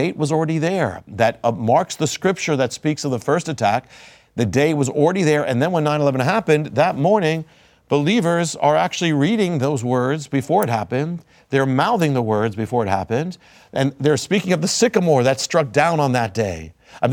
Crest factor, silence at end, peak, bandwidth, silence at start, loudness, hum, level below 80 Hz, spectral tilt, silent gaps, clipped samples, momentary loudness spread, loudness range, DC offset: 18 dB; 0 s; 0 dBFS; 17.5 kHz; 0 s; -19 LUFS; none; -56 dBFS; -5.5 dB/octave; none; under 0.1%; 7 LU; 2 LU; under 0.1%